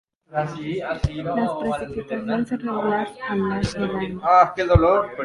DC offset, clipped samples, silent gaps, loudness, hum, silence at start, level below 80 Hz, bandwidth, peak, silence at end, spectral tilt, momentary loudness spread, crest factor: under 0.1%; under 0.1%; none; -22 LUFS; none; 0.3 s; -36 dBFS; 11.5 kHz; -2 dBFS; 0 s; -7 dB/octave; 11 LU; 20 dB